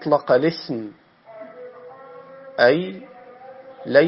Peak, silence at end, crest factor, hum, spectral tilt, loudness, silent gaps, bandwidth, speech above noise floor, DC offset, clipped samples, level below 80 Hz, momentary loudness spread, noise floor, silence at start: -2 dBFS; 0 s; 20 dB; none; -9.5 dB/octave; -20 LUFS; none; 5.8 kHz; 23 dB; under 0.1%; under 0.1%; -70 dBFS; 25 LU; -42 dBFS; 0 s